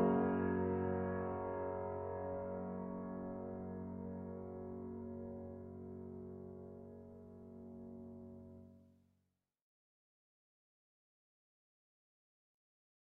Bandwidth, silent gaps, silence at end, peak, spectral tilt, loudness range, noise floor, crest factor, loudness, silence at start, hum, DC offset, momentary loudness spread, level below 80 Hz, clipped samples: 3.3 kHz; none; 4.2 s; -22 dBFS; -6 dB/octave; 17 LU; -85 dBFS; 22 dB; -44 LUFS; 0 s; none; under 0.1%; 18 LU; -70 dBFS; under 0.1%